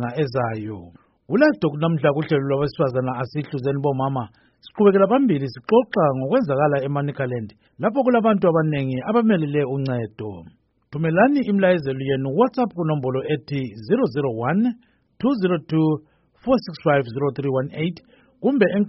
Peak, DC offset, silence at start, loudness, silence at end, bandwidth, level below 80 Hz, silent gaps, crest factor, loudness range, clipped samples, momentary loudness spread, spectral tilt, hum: -4 dBFS; under 0.1%; 0 s; -21 LUFS; 0 s; 5.8 kHz; -58 dBFS; none; 16 dB; 3 LU; under 0.1%; 11 LU; -6.5 dB/octave; none